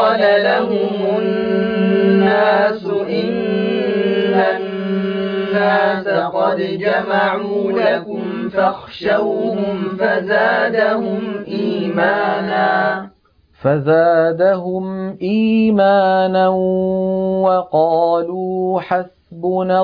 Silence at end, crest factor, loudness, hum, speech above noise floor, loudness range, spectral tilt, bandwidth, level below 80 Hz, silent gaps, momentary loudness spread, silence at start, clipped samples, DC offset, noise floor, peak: 0 s; 14 dB; -16 LUFS; none; 36 dB; 3 LU; -9 dB/octave; 5.2 kHz; -56 dBFS; none; 8 LU; 0 s; under 0.1%; under 0.1%; -52 dBFS; -2 dBFS